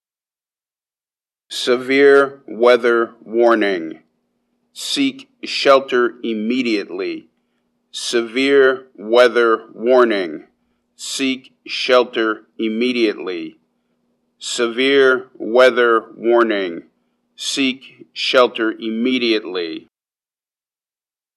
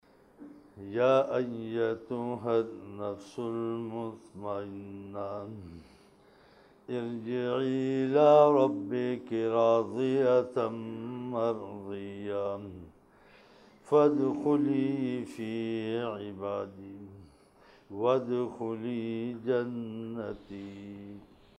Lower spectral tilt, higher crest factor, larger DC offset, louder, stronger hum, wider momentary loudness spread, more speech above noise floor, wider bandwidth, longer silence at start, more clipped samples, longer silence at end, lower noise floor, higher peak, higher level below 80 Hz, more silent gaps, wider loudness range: second, -3 dB/octave vs -8 dB/octave; about the same, 18 dB vs 22 dB; neither; first, -17 LUFS vs -30 LUFS; neither; second, 15 LU vs 18 LU; first, over 74 dB vs 30 dB; first, 12.5 kHz vs 10.5 kHz; first, 1.5 s vs 0.4 s; neither; first, 1.55 s vs 0.35 s; first, under -90 dBFS vs -60 dBFS; first, 0 dBFS vs -10 dBFS; second, -80 dBFS vs -70 dBFS; neither; second, 4 LU vs 12 LU